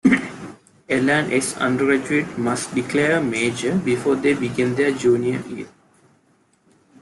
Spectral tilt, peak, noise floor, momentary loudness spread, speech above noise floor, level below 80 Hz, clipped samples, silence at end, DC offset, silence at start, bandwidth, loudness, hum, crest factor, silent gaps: -5 dB/octave; -4 dBFS; -60 dBFS; 13 LU; 40 dB; -58 dBFS; under 0.1%; 1.35 s; under 0.1%; 0.05 s; 12 kHz; -20 LUFS; none; 18 dB; none